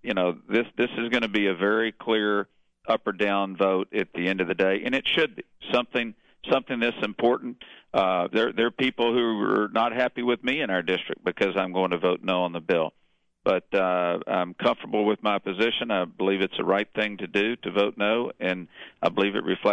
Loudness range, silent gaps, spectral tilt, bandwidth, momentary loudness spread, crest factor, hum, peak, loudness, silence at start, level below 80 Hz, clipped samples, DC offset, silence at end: 1 LU; none; -6 dB/octave; 8.8 kHz; 5 LU; 18 dB; none; -8 dBFS; -25 LUFS; 0.05 s; -64 dBFS; under 0.1%; under 0.1%; 0 s